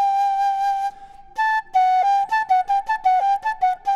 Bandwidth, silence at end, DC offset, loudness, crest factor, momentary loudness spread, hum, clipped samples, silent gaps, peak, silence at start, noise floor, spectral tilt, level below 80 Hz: 12 kHz; 0 s; under 0.1%; -20 LUFS; 10 dB; 5 LU; none; under 0.1%; none; -10 dBFS; 0 s; -38 dBFS; -0.5 dB/octave; -54 dBFS